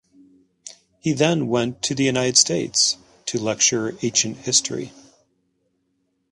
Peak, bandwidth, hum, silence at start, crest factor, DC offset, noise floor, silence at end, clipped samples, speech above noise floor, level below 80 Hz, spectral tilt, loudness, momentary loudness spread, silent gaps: -2 dBFS; 11.5 kHz; none; 0.65 s; 22 dB; under 0.1%; -71 dBFS; 1.4 s; under 0.1%; 50 dB; -60 dBFS; -2.5 dB/octave; -20 LUFS; 14 LU; none